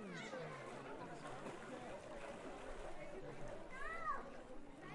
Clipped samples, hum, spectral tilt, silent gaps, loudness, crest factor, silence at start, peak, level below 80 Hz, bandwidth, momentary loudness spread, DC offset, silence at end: under 0.1%; none; -5 dB/octave; none; -51 LUFS; 18 dB; 0 s; -32 dBFS; -60 dBFS; 11.5 kHz; 7 LU; under 0.1%; 0 s